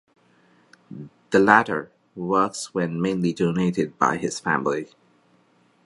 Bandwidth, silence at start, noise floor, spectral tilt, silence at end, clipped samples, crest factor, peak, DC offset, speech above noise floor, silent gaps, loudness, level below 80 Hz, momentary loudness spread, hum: 11.5 kHz; 0.9 s; -61 dBFS; -5.5 dB/octave; 1 s; under 0.1%; 24 dB; 0 dBFS; under 0.1%; 39 dB; none; -22 LUFS; -62 dBFS; 24 LU; none